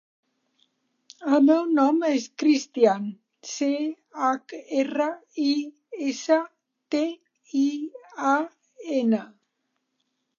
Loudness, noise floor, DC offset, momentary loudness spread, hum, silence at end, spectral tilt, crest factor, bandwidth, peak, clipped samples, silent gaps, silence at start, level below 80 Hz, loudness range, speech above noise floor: -24 LUFS; -77 dBFS; under 0.1%; 16 LU; none; 1.1 s; -4.5 dB/octave; 20 dB; 7.2 kHz; -6 dBFS; under 0.1%; none; 1.2 s; -84 dBFS; 5 LU; 54 dB